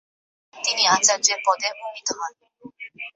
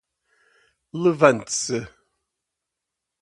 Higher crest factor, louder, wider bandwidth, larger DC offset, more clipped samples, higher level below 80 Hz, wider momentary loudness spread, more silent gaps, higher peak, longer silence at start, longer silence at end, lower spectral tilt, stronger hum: about the same, 22 dB vs 24 dB; about the same, -20 LUFS vs -21 LUFS; second, 8.4 kHz vs 11.5 kHz; neither; neither; second, -78 dBFS vs -62 dBFS; about the same, 19 LU vs 18 LU; neither; about the same, -2 dBFS vs 0 dBFS; second, 0.55 s vs 0.95 s; second, 0.05 s vs 1.35 s; second, 1 dB/octave vs -4.5 dB/octave; neither